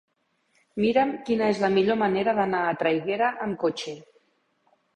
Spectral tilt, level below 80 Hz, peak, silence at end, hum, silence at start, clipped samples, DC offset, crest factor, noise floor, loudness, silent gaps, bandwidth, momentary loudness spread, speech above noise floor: -6 dB/octave; -64 dBFS; -8 dBFS; 0.95 s; none; 0.75 s; under 0.1%; under 0.1%; 18 dB; -71 dBFS; -24 LUFS; none; 9.6 kHz; 9 LU; 47 dB